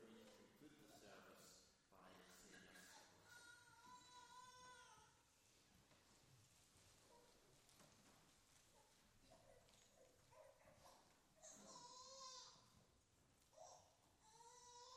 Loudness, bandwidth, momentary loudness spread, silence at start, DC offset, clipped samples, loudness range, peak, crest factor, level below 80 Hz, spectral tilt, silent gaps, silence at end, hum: -65 LUFS; 15.5 kHz; 9 LU; 0 s; under 0.1%; under 0.1%; 4 LU; -48 dBFS; 20 dB; -86 dBFS; -2 dB/octave; none; 0 s; none